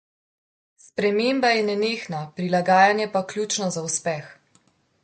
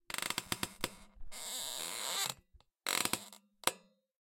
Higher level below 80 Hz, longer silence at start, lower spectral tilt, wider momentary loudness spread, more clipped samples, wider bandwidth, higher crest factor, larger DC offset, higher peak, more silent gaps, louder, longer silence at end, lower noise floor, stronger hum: second, -70 dBFS vs -62 dBFS; first, 0.95 s vs 0.1 s; first, -3.5 dB/octave vs -0.5 dB/octave; second, 12 LU vs 18 LU; neither; second, 9.4 kHz vs 17 kHz; second, 20 dB vs 32 dB; neither; first, -4 dBFS vs -8 dBFS; neither; first, -22 LUFS vs -37 LUFS; first, 0.7 s vs 0.45 s; about the same, -63 dBFS vs -66 dBFS; neither